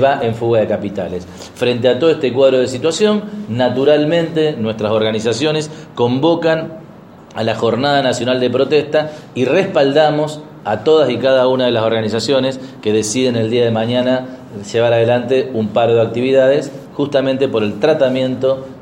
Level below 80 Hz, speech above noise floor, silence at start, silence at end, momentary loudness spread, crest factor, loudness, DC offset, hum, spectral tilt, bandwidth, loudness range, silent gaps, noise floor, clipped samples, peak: -56 dBFS; 23 dB; 0 s; 0 s; 9 LU; 14 dB; -15 LUFS; under 0.1%; none; -5.5 dB/octave; 12 kHz; 2 LU; none; -38 dBFS; under 0.1%; 0 dBFS